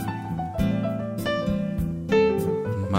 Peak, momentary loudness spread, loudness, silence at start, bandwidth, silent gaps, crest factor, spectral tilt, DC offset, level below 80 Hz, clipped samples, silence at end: -10 dBFS; 8 LU; -25 LUFS; 0 s; 16 kHz; none; 16 dB; -7.5 dB/octave; under 0.1%; -40 dBFS; under 0.1%; 0 s